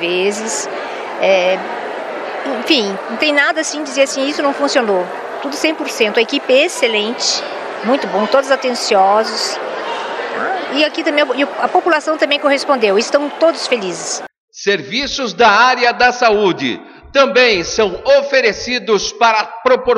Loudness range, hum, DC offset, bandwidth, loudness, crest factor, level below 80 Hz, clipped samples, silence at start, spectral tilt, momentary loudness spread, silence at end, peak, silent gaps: 3 LU; none; under 0.1%; 13 kHz; -14 LUFS; 14 dB; -50 dBFS; under 0.1%; 0 s; -2.5 dB/octave; 10 LU; 0 s; 0 dBFS; 14.38-14.48 s